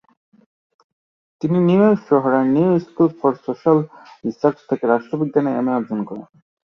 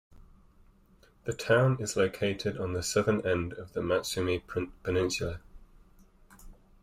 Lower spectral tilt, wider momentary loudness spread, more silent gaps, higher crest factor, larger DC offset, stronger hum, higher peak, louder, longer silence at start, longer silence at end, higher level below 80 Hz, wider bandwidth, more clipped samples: first, -10 dB/octave vs -5 dB/octave; about the same, 12 LU vs 11 LU; neither; about the same, 16 dB vs 20 dB; neither; neither; first, -2 dBFS vs -12 dBFS; first, -18 LUFS vs -30 LUFS; first, 1.45 s vs 0.1 s; first, 0.5 s vs 0.3 s; second, -62 dBFS vs -54 dBFS; second, 6.6 kHz vs 16 kHz; neither